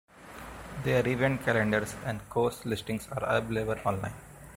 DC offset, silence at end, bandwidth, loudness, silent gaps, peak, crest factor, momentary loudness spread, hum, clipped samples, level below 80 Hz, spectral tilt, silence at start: under 0.1%; 0 s; 16.5 kHz; -30 LUFS; none; -10 dBFS; 20 dB; 17 LU; none; under 0.1%; -52 dBFS; -6 dB/octave; 0.15 s